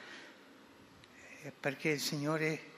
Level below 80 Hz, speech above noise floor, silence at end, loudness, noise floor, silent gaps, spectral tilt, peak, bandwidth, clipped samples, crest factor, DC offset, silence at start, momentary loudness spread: -84 dBFS; 23 dB; 0 s; -36 LUFS; -59 dBFS; none; -4.5 dB/octave; -20 dBFS; 15.5 kHz; under 0.1%; 20 dB; under 0.1%; 0 s; 24 LU